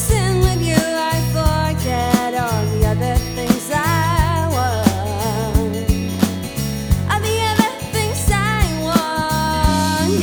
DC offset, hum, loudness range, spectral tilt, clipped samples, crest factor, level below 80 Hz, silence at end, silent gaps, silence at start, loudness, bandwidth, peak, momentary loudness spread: under 0.1%; none; 1 LU; -5 dB/octave; under 0.1%; 18 dB; -26 dBFS; 0 s; none; 0 s; -18 LUFS; over 20 kHz; 0 dBFS; 4 LU